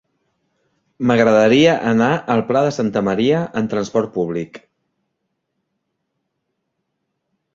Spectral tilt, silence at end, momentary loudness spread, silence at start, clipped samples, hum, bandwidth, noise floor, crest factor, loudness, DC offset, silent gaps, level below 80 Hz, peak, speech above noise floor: -6 dB/octave; 2.95 s; 10 LU; 1 s; under 0.1%; none; 7.6 kHz; -74 dBFS; 18 dB; -17 LUFS; under 0.1%; none; -56 dBFS; -2 dBFS; 58 dB